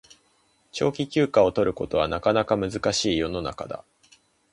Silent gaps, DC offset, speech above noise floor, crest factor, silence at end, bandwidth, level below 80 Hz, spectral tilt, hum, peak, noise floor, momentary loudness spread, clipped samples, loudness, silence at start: none; under 0.1%; 41 dB; 20 dB; 0.75 s; 11.5 kHz; -48 dBFS; -5 dB/octave; none; -6 dBFS; -65 dBFS; 14 LU; under 0.1%; -24 LUFS; 0.75 s